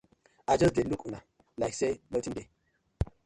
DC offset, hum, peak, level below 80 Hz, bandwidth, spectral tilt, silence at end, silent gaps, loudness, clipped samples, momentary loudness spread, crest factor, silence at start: under 0.1%; none; -12 dBFS; -48 dBFS; 11.5 kHz; -6 dB/octave; 0.2 s; none; -31 LUFS; under 0.1%; 17 LU; 20 dB; 0.5 s